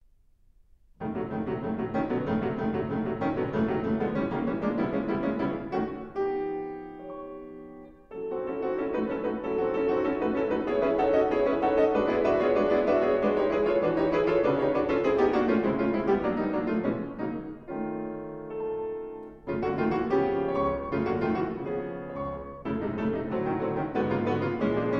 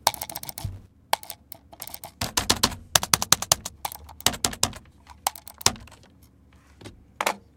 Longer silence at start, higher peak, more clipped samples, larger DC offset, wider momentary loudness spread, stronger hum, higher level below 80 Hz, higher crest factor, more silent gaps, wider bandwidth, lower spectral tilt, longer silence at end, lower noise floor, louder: first, 1 s vs 0.05 s; second, -12 dBFS vs 0 dBFS; neither; neither; second, 12 LU vs 19 LU; neither; about the same, -52 dBFS vs -48 dBFS; second, 16 dB vs 28 dB; neither; second, 7 kHz vs 17.5 kHz; first, -8.5 dB/octave vs -1 dB/octave; second, 0 s vs 0.2 s; first, -60 dBFS vs -55 dBFS; second, -28 LUFS vs -25 LUFS